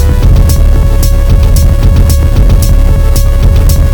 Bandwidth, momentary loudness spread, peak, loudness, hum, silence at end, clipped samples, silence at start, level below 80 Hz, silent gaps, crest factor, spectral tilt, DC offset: 19 kHz; 2 LU; 0 dBFS; -8 LUFS; none; 0 s; 7%; 0 s; -6 dBFS; none; 4 dB; -6 dB/octave; under 0.1%